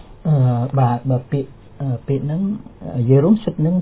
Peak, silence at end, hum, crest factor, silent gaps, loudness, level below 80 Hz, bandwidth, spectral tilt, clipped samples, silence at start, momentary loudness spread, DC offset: -2 dBFS; 0 s; none; 16 dB; none; -19 LUFS; -46 dBFS; 4 kHz; -13.5 dB/octave; under 0.1%; 0 s; 12 LU; under 0.1%